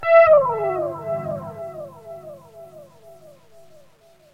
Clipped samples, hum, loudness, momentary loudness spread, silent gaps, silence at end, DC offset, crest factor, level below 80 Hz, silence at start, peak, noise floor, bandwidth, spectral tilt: under 0.1%; none; -18 LUFS; 27 LU; none; 1.5 s; under 0.1%; 18 dB; -62 dBFS; 0 s; -4 dBFS; -53 dBFS; 5.6 kHz; -7 dB/octave